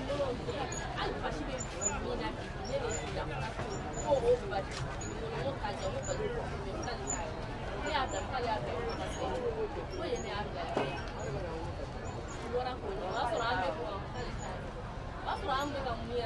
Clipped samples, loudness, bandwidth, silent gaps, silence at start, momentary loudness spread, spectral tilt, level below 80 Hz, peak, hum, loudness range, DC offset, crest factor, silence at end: under 0.1%; -36 LUFS; 12 kHz; none; 0 s; 7 LU; -4.5 dB/octave; -46 dBFS; -16 dBFS; none; 2 LU; under 0.1%; 18 dB; 0 s